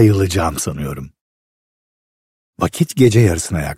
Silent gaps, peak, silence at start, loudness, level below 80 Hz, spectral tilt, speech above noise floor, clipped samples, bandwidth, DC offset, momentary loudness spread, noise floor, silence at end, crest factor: 1.21-2.53 s; 0 dBFS; 0 s; -16 LUFS; -36 dBFS; -6 dB/octave; over 75 dB; under 0.1%; 15.5 kHz; under 0.1%; 14 LU; under -90 dBFS; 0.05 s; 16 dB